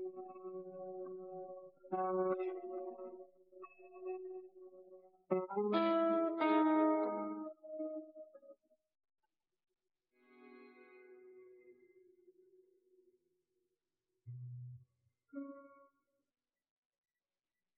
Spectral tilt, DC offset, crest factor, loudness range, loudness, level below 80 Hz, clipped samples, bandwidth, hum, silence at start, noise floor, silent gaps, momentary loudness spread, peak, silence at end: -5.5 dB/octave; under 0.1%; 22 dB; 22 LU; -39 LUFS; under -90 dBFS; under 0.1%; 4.5 kHz; none; 0 s; under -90 dBFS; none; 27 LU; -20 dBFS; 2.05 s